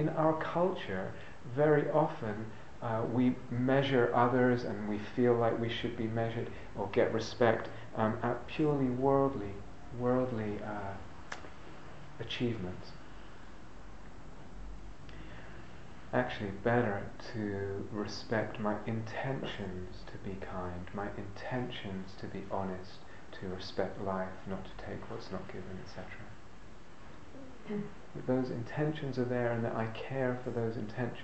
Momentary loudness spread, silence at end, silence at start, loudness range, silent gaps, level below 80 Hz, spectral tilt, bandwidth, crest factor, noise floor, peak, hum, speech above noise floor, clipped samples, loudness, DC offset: 22 LU; 0 s; 0 s; 12 LU; none; -58 dBFS; -7.5 dB/octave; 8.4 kHz; 22 dB; -54 dBFS; -12 dBFS; none; 20 dB; under 0.1%; -35 LUFS; 0.6%